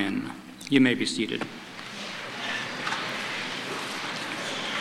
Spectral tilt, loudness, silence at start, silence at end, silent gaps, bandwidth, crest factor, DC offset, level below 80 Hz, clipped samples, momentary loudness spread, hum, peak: -3.5 dB/octave; -29 LUFS; 0 s; 0 s; none; 15.5 kHz; 22 dB; under 0.1%; -68 dBFS; under 0.1%; 14 LU; none; -6 dBFS